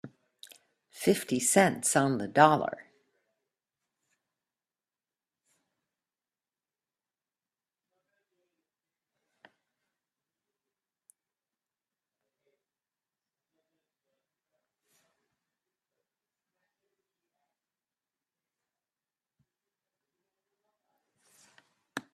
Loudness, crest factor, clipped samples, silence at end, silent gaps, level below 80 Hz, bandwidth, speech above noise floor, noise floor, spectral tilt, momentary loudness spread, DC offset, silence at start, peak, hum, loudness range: -26 LUFS; 30 dB; under 0.1%; 0.15 s; none; -76 dBFS; 13.5 kHz; over 64 dB; under -90 dBFS; -4 dB/octave; 19 LU; under 0.1%; 0.05 s; -6 dBFS; none; 4 LU